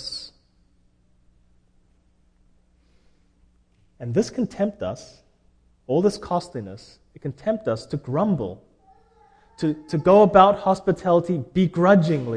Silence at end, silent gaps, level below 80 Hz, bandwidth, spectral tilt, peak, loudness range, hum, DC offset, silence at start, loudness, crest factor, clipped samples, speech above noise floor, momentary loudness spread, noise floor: 0 s; none; -54 dBFS; 10 kHz; -7.5 dB/octave; 0 dBFS; 11 LU; none; under 0.1%; 0 s; -21 LUFS; 22 dB; under 0.1%; 40 dB; 20 LU; -61 dBFS